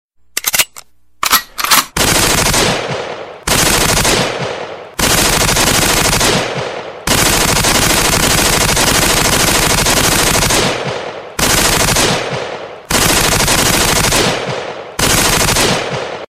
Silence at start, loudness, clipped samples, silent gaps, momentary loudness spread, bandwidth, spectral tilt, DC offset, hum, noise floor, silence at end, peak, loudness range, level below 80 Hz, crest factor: 0.35 s; -11 LUFS; under 0.1%; none; 11 LU; 16.5 kHz; -2 dB/octave; 0.2%; none; -39 dBFS; 0.05 s; 0 dBFS; 3 LU; -26 dBFS; 14 dB